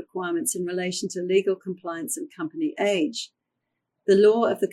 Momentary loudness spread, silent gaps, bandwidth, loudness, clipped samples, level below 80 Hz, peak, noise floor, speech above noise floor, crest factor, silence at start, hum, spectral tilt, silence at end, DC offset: 14 LU; none; 15 kHz; -25 LUFS; under 0.1%; -74 dBFS; -8 dBFS; -81 dBFS; 57 dB; 18 dB; 0 s; none; -4 dB/octave; 0 s; under 0.1%